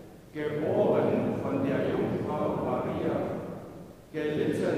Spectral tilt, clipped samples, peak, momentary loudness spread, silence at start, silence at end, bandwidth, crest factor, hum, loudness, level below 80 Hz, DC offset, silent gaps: -8 dB/octave; under 0.1%; -14 dBFS; 15 LU; 0 s; 0 s; 15.5 kHz; 16 dB; none; -29 LUFS; -60 dBFS; under 0.1%; none